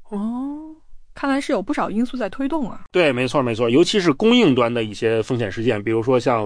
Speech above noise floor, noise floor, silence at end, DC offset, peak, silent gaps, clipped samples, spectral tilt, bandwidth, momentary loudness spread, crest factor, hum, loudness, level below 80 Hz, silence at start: 20 dB; -39 dBFS; 0 s; under 0.1%; -4 dBFS; none; under 0.1%; -5.5 dB/octave; 10.5 kHz; 11 LU; 14 dB; none; -20 LUFS; -46 dBFS; 0 s